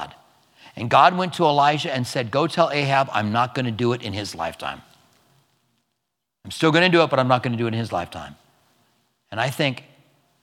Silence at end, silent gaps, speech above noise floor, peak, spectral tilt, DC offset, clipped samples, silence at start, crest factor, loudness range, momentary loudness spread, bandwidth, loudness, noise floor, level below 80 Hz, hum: 0.65 s; none; 59 dB; -2 dBFS; -5.5 dB/octave; under 0.1%; under 0.1%; 0 s; 22 dB; 7 LU; 18 LU; 16 kHz; -21 LUFS; -80 dBFS; -62 dBFS; none